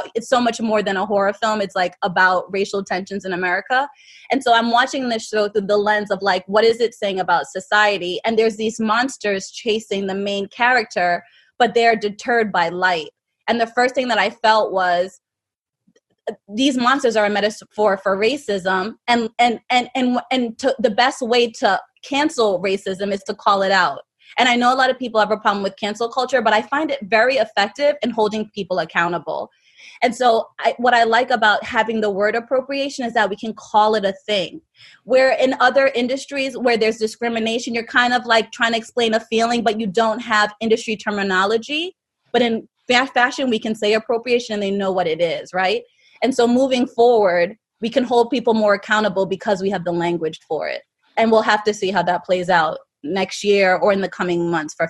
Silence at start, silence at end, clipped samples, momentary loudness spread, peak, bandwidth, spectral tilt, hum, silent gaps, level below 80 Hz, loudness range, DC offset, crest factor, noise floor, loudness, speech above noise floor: 0 s; 0 s; under 0.1%; 8 LU; 0 dBFS; 12 kHz; -4 dB/octave; none; none; -64 dBFS; 2 LU; under 0.1%; 18 dB; -86 dBFS; -18 LUFS; 67 dB